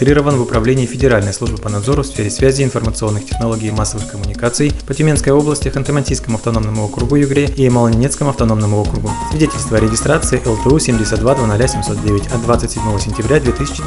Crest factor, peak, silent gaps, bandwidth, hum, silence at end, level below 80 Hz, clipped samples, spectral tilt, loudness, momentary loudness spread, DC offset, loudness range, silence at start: 14 dB; 0 dBFS; none; 11.5 kHz; none; 0 s; -26 dBFS; under 0.1%; -5.5 dB/octave; -15 LUFS; 6 LU; under 0.1%; 2 LU; 0 s